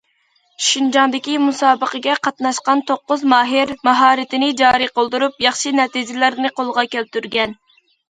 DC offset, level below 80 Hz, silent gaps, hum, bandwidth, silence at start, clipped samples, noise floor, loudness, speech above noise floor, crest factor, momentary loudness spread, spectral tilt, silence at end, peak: under 0.1%; -60 dBFS; none; none; 9.4 kHz; 0.6 s; under 0.1%; -61 dBFS; -16 LUFS; 45 dB; 16 dB; 6 LU; -1.5 dB/octave; 0.55 s; 0 dBFS